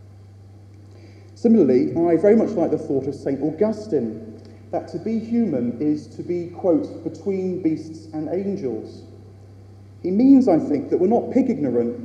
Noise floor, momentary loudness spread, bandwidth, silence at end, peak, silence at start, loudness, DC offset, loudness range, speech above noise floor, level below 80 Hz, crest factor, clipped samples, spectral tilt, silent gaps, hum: -44 dBFS; 14 LU; 8.4 kHz; 0 s; -4 dBFS; 0.05 s; -21 LUFS; under 0.1%; 6 LU; 24 dB; -62 dBFS; 18 dB; under 0.1%; -9 dB/octave; none; none